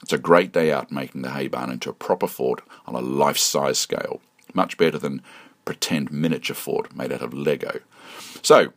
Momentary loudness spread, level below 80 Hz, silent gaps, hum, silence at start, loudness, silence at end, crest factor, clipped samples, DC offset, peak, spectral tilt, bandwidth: 15 LU; -66 dBFS; none; none; 0.1 s; -23 LUFS; 0.1 s; 22 dB; under 0.1%; under 0.1%; 0 dBFS; -3.5 dB/octave; 15.5 kHz